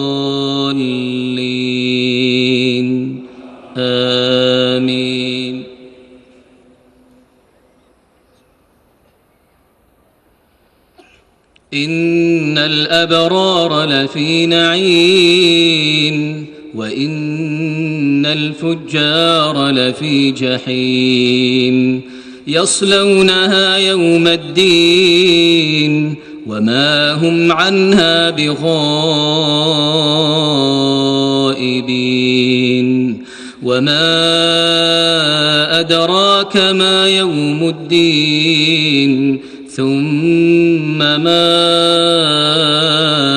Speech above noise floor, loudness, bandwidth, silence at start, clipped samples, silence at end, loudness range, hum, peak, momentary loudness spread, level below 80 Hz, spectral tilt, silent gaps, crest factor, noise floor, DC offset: 42 dB; -12 LUFS; 12 kHz; 0 s; under 0.1%; 0 s; 6 LU; none; -2 dBFS; 9 LU; -54 dBFS; -4.5 dB/octave; none; 12 dB; -54 dBFS; under 0.1%